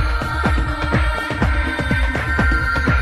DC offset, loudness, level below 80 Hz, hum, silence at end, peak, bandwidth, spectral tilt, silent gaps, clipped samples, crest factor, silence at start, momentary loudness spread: under 0.1%; -19 LUFS; -22 dBFS; none; 0 s; -6 dBFS; 12.5 kHz; -6 dB/octave; none; under 0.1%; 12 dB; 0 s; 3 LU